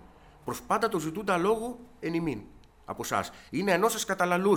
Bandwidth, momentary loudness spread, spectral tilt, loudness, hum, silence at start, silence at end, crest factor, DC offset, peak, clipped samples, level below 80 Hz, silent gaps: 19.5 kHz; 13 LU; -4.5 dB/octave; -29 LUFS; none; 0.45 s; 0 s; 18 dB; under 0.1%; -10 dBFS; under 0.1%; -58 dBFS; none